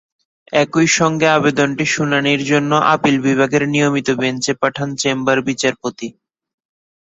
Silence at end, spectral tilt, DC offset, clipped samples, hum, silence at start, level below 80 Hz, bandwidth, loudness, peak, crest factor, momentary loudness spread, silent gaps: 0.95 s; -4.5 dB/octave; under 0.1%; under 0.1%; none; 0.5 s; -56 dBFS; 8.2 kHz; -16 LUFS; -2 dBFS; 16 dB; 6 LU; none